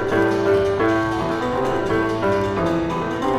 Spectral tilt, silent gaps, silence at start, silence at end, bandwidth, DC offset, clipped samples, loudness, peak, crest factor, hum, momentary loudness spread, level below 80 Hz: -6.5 dB/octave; none; 0 s; 0 s; 13.5 kHz; under 0.1%; under 0.1%; -20 LUFS; -6 dBFS; 14 dB; none; 4 LU; -42 dBFS